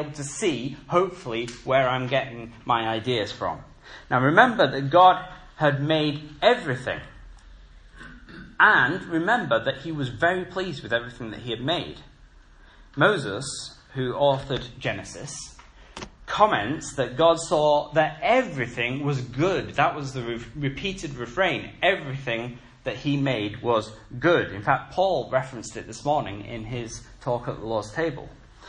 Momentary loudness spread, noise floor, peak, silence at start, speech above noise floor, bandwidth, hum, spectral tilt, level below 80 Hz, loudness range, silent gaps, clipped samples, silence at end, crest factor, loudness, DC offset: 16 LU; -51 dBFS; 0 dBFS; 0 s; 27 dB; 10.5 kHz; none; -5 dB/octave; -50 dBFS; 6 LU; none; under 0.1%; 0 s; 24 dB; -24 LUFS; under 0.1%